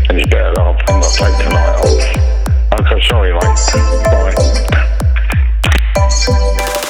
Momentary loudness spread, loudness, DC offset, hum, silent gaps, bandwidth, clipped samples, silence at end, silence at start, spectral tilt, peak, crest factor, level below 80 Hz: 2 LU; -12 LUFS; under 0.1%; none; none; 16 kHz; under 0.1%; 0 s; 0 s; -4.5 dB/octave; 0 dBFS; 10 dB; -12 dBFS